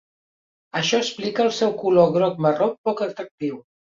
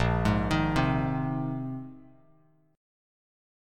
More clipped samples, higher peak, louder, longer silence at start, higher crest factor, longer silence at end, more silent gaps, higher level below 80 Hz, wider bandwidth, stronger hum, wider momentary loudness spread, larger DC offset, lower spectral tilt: neither; first, -4 dBFS vs -12 dBFS; first, -21 LUFS vs -28 LUFS; first, 0.75 s vs 0 s; about the same, 18 dB vs 18 dB; second, 0.4 s vs 1.7 s; first, 2.78-2.84 s, 3.31-3.38 s vs none; second, -64 dBFS vs -42 dBFS; second, 7.6 kHz vs 13 kHz; neither; about the same, 12 LU vs 12 LU; neither; second, -5 dB/octave vs -7 dB/octave